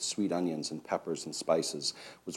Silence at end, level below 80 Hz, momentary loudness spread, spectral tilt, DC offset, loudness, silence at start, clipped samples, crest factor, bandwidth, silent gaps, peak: 0 s; -78 dBFS; 7 LU; -3.5 dB/octave; under 0.1%; -33 LUFS; 0 s; under 0.1%; 20 dB; 16 kHz; none; -14 dBFS